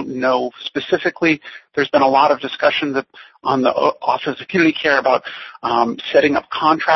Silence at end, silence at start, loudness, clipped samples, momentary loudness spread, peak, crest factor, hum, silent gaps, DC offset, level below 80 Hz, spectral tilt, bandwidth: 0 s; 0 s; -17 LUFS; under 0.1%; 9 LU; 0 dBFS; 16 dB; none; none; under 0.1%; -60 dBFS; -5.5 dB/octave; 6.2 kHz